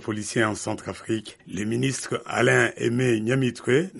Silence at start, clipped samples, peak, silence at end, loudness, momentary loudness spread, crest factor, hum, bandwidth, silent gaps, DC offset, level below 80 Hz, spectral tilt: 0 s; under 0.1%; -6 dBFS; 0 s; -24 LUFS; 11 LU; 18 dB; none; 11.5 kHz; none; under 0.1%; -60 dBFS; -5 dB/octave